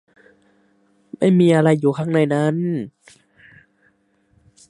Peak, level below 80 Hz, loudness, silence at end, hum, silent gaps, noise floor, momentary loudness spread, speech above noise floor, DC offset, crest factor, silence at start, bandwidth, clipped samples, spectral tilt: -2 dBFS; -66 dBFS; -18 LUFS; 1.8 s; none; none; -62 dBFS; 11 LU; 45 dB; under 0.1%; 18 dB; 1.2 s; 11 kHz; under 0.1%; -8 dB/octave